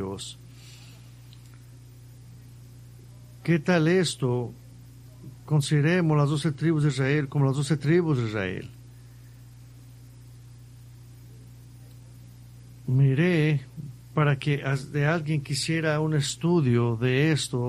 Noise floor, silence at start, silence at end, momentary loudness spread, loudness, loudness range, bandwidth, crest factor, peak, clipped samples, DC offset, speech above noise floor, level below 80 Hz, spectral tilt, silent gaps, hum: -47 dBFS; 0 s; 0 s; 19 LU; -25 LUFS; 10 LU; 13 kHz; 18 dB; -8 dBFS; under 0.1%; under 0.1%; 23 dB; -56 dBFS; -6 dB/octave; none; 60 Hz at -45 dBFS